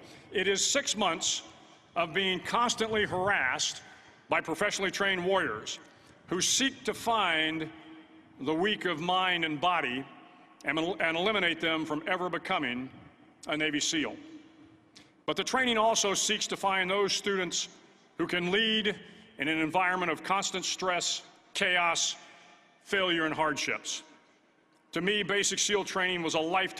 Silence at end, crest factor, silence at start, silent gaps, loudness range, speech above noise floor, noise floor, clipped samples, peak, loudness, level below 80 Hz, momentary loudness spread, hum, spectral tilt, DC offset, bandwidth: 0 s; 18 dB; 0 s; none; 3 LU; 36 dB; -66 dBFS; under 0.1%; -12 dBFS; -29 LUFS; -66 dBFS; 11 LU; none; -2 dB/octave; under 0.1%; 14.5 kHz